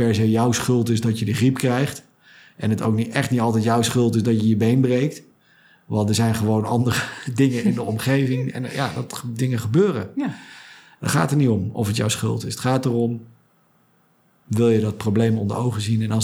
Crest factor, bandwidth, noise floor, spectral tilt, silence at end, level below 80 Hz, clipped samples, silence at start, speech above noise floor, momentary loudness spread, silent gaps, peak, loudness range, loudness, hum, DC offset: 18 dB; over 20 kHz; -59 dBFS; -6 dB/octave; 0 s; -60 dBFS; under 0.1%; 0 s; 39 dB; 9 LU; none; -2 dBFS; 3 LU; -21 LUFS; none; under 0.1%